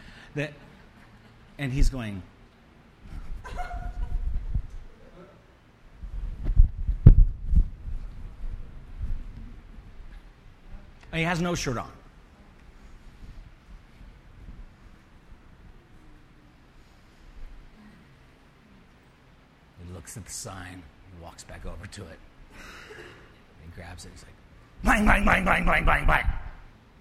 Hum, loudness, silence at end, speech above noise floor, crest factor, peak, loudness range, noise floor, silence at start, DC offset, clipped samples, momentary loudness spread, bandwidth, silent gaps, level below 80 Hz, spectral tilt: none; -27 LUFS; 0.35 s; 30 dB; 28 dB; 0 dBFS; 20 LU; -56 dBFS; 0.1 s; under 0.1%; under 0.1%; 29 LU; 13 kHz; none; -30 dBFS; -5.5 dB/octave